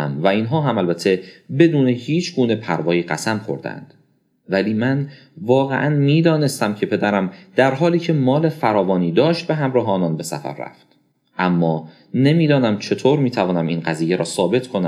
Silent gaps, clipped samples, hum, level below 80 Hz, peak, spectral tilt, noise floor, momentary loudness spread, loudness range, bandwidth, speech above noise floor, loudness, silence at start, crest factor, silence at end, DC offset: none; under 0.1%; none; -68 dBFS; -2 dBFS; -6.5 dB/octave; -60 dBFS; 11 LU; 4 LU; 15 kHz; 42 dB; -18 LUFS; 0 s; 18 dB; 0 s; under 0.1%